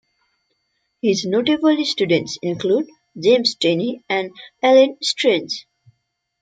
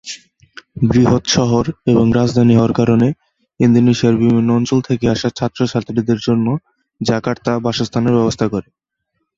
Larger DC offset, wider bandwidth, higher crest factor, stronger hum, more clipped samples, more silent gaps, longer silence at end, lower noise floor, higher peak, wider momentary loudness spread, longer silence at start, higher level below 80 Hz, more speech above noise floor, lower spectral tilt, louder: neither; first, 9.2 kHz vs 7.6 kHz; about the same, 18 dB vs 14 dB; neither; neither; neither; about the same, 0.8 s vs 0.75 s; about the same, -73 dBFS vs -72 dBFS; about the same, -2 dBFS vs -2 dBFS; about the same, 10 LU vs 8 LU; first, 1.05 s vs 0.05 s; second, -68 dBFS vs -42 dBFS; about the same, 55 dB vs 58 dB; second, -4.5 dB/octave vs -6.5 dB/octave; second, -18 LUFS vs -15 LUFS